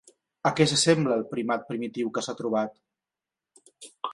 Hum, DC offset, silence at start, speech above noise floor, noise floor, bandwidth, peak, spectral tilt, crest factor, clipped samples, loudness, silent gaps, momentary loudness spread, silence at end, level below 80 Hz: none; under 0.1%; 0.45 s; 64 dB; -90 dBFS; 11.5 kHz; -6 dBFS; -4 dB/octave; 22 dB; under 0.1%; -26 LUFS; none; 11 LU; 0 s; -66 dBFS